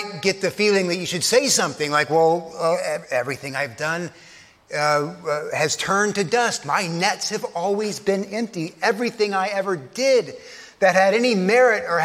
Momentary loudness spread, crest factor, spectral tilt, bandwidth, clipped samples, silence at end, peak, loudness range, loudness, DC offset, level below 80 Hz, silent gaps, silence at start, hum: 10 LU; 18 dB; -3.5 dB/octave; 15.5 kHz; under 0.1%; 0 s; -2 dBFS; 4 LU; -21 LUFS; under 0.1%; -66 dBFS; none; 0 s; none